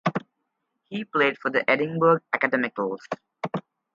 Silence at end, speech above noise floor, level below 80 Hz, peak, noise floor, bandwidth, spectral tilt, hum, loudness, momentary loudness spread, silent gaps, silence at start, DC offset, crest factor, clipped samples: 0.35 s; 54 dB; -72 dBFS; -6 dBFS; -78 dBFS; 7.2 kHz; -7 dB/octave; none; -24 LUFS; 14 LU; none; 0.05 s; under 0.1%; 20 dB; under 0.1%